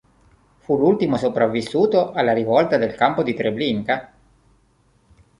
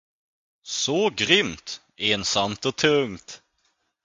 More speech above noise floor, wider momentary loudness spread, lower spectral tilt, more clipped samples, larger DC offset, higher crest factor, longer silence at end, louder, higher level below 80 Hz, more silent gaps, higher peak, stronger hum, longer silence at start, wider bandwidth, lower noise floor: second, 41 dB vs 47 dB; second, 6 LU vs 16 LU; first, -7 dB/octave vs -2.5 dB/octave; neither; neither; second, 18 dB vs 24 dB; first, 1.35 s vs 0.7 s; first, -19 LUFS vs -22 LUFS; about the same, -56 dBFS vs -58 dBFS; neither; about the same, -2 dBFS vs -2 dBFS; neither; about the same, 0.7 s vs 0.65 s; first, 11 kHz vs 9.6 kHz; second, -59 dBFS vs -71 dBFS